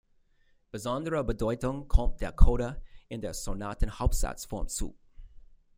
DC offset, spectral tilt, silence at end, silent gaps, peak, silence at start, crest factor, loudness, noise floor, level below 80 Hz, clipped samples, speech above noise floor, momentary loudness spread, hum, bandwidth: under 0.1%; -5.5 dB/octave; 0.4 s; none; -4 dBFS; 0.75 s; 24 dB; -32 LUFS; -65 dBFS; -30 dBFS; under 0.1%; 39 dB; 12 LU; none; 16 kHz